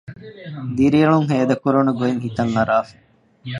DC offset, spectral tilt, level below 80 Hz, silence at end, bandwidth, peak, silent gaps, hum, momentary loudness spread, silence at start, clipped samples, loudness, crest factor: under 0.1%; -8 dB/octave; -52 dBFS; 0 s; 10.5 kHz; -2 dBFS; none; none; 20 LU; 0.1 s; under 0.1%; -18 LUFS; 16 dB